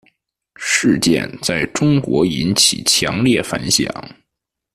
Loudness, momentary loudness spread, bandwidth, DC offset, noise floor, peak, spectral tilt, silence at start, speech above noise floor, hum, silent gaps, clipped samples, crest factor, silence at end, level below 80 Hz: -15 LUFS; 7 LU; 14.5 kHz; under 0.1%; -80 dBFS; 0 dBFS; -3.5 dB/octave; 0.6 s; 64 dB; none; none; under 0.1%; 18 dB; 0.65 s; -46 dBFS